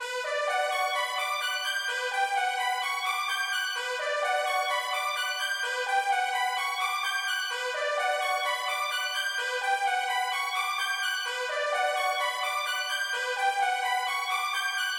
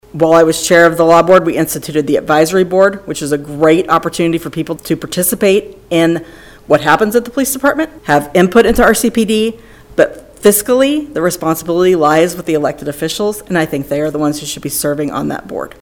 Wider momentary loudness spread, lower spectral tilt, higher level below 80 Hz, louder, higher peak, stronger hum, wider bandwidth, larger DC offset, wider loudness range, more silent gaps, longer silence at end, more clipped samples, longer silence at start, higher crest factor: second, 2 LU vs 10 LU; second, 5 dB/octave vs -4.5 dB/octave; second, -80 dBFS vs -40 dBFS; second, -28 LUFS vs -12 LUFS; second, -14 dBFS vs 0 dBFS; neither; about the same, 17 kHz vs 18 kHz; neither; second, 0 LU vs 3 LU; neither; second, 0 s vs 0.15 s; second, under 0.1% vs 0.7%; second, 0 s vs 0.15 s; about the same, 16 dB vs 12 dB